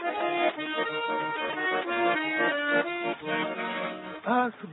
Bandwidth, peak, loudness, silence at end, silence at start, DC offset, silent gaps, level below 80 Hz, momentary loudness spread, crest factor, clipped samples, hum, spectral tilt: 4.1 kHz; -12 dBFS; -28 LUFS; 0 s; 0 s; under 0.1%; none; -76 dBFS; 6 LU; 16 dB; under 0.1%; none; -8.5 dB/octave